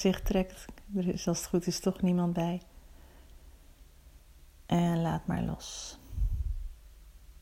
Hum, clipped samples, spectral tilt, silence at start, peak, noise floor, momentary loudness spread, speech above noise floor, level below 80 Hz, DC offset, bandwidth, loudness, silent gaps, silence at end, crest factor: none; under 0.1%; -6 dB/octave; 0 s; -14 dBFS; -55 dBFS; 12 LU; 25 dB; -42 dBFS; under 0.1%; 16 kHz; -32 LUFS; none; 0.1 s; 18 dB